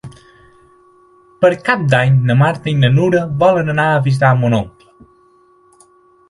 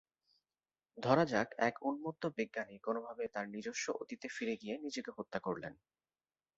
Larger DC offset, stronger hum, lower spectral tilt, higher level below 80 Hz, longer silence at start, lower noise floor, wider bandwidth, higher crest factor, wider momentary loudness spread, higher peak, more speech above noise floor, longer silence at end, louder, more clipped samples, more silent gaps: neither; neither; first, -7.5 dB/octave vs -4 dB/octave; first, -48 dBFS vs -76 dBFS; second, 0.05 s vs 0.95 s; second, -51 dBFS vs under -90 dBFS; first, 11.5 kHz vs 7.6 kHz; second, 16 dB vs 24 dB; second, 4 LU vs 11 LU; first, 0 dBFS vs -16 dBFS; second, 38 dB vs over 51 dB; first, 1.6 s vs 0.85 s; first, -13 LUFS vs -39 LUFS; neither; neither